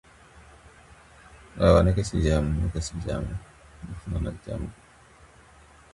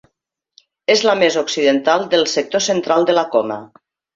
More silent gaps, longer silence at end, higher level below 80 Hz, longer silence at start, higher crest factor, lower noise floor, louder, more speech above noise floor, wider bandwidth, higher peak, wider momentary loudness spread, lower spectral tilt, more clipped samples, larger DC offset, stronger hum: neither; first, 1.2 s vs 0.5 s; first, -36 dBFS vs -64 dBFS; second, 0.35 s vs 0.9 s; first, 24 dB vs 16 dB; second, -53 dBFS vs -74 dBFS; second, -26 LUFS vs -16 LUFS; second, 29 dB vs 58 dB; first, 11.5 kHz vs 7.8 kHz; about the same, -4 dBFS vs -2 dBFS; first, 20 LU vs 5 LU; first, -7 dB/octave vs -3 dB/octave; neither; neither; neither